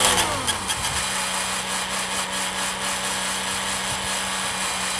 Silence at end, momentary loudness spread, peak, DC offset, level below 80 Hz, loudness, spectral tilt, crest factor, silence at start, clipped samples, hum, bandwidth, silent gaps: 0 s; 2 LU; -2 dBFS; under 0.1%; -48 dBFS; -23 LUFS; -1 dB/octave; 22 dB; 0 s; under 0.1%; none; 12 kHz; none